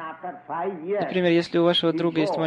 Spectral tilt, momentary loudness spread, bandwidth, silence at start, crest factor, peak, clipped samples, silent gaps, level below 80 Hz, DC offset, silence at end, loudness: -6.5 dB/octave; 12 LU; 10.5 kHz; 0 s; 16 dB; -8 dBFS; under 0.1%; none; -68 dBFS; under 0.1%; 0 s; -23 LUFS